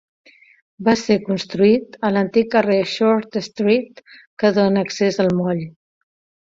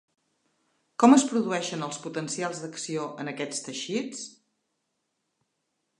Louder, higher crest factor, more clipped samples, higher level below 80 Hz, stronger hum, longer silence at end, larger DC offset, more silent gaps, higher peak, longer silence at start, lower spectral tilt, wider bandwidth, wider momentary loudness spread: first, -18 LUFS vs -27 LUFS; second, 16 dB vs 24 dB; neither; first, -58 dBFS vs -82 dBFS; neither; second, 0.75 s vs 1.7 s; neither; first, 4.27-4.37 s vs none; about the same, -2 dBFS vs -4 dBFS; second, 0.8 s vs 1 s; first, -6 dB/octave vs -4 dB/octave; second, 7.8 kHz vs 11 kHz; second, 7 LU vs 17 LU